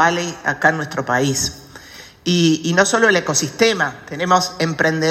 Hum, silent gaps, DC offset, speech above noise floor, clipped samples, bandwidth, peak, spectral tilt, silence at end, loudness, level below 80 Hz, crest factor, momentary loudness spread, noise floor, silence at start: none; none; under 0.1%; 23 dB; under 0.1%; 15 kHz; 0 dBFS; -3.5 dB/octave; 0 s; -17 LUFS; -52 dBFS; 18 dB; 10 LU; -40 dBFS; 0 s